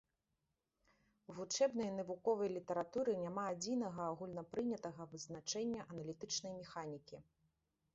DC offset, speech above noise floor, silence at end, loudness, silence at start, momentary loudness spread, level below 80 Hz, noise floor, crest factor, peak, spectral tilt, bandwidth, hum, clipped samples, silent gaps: under 0.1%; 46 dB; 0.75 s; -42 LUFS; 1.3 s; 13 LU; -78 dBFS; -88 dBFS; 20 dB; -24 dBFS; -4.5 dB/octave; 7.6 kHz; none; under 0.1%; none